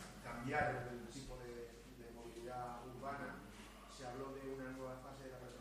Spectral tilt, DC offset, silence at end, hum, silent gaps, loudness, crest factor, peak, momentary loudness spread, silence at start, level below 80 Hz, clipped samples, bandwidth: -5 dB/octave; under 0.1%; 0 s; none; none; -48 LUFS; 24 dB; -24 dBFS; 14 LU; 0 s; -62 dBFS; under 0.1%; 15.5 kHz